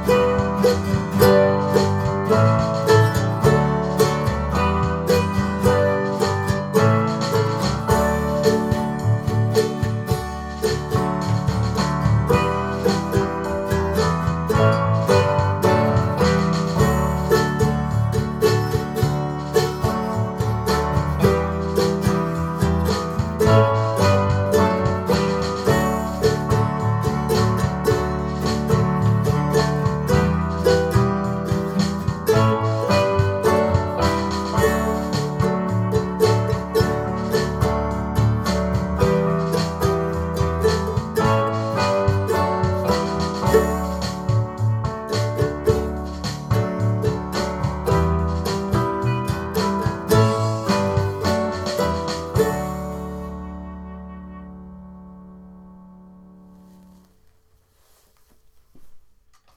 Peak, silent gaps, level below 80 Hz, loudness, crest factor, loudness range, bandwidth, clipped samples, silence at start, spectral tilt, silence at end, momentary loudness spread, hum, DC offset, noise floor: 0 dBFS; none; -34 dBFS; -20 LUFS; 20 dB; 4 LU; 15.5 kHz; under 0.1%; 0 s; -6.5 dB/octave; 0.55 s; 6 LU; none; under 0.1%; -58 dBFS